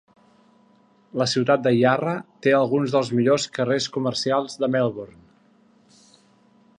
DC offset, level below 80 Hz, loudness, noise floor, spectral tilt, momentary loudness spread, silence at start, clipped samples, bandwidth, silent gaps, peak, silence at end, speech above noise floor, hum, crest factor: under 0.1%; -68 dBFS; -22 LUFS; -58 dBFS; -5.5 dB/octave; 7 LU; 1.15 s; under 0.1%; 10 kHz; none; -4 dBFS; 1.7 s; 37 dB; none; 20 dB